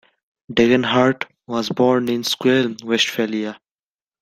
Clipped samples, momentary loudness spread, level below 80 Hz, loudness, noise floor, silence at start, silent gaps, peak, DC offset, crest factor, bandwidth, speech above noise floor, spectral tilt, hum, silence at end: under 0.1%; 10 LU; -56 dBFS; -19 LUFS; under -90 dBFS; 0.5 s; none; -2 dBFS; under 0.1%; 18 dB; 15.5 kHz; over 72 dB; -4.5 dB/octave; none; 0.65 s